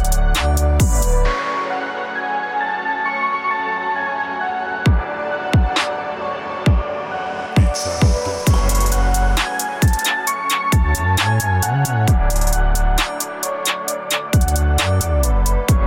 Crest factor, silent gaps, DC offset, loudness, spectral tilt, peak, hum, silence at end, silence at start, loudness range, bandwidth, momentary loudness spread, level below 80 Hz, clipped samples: 14 dB; none; under 0.1%; -19 LUFS; -4.5 dB/octave; -4 dBFS; none; 0 s; 0 s; 3 LU; 17 kHz; 6 LU; -20 dBFS; under 0.1%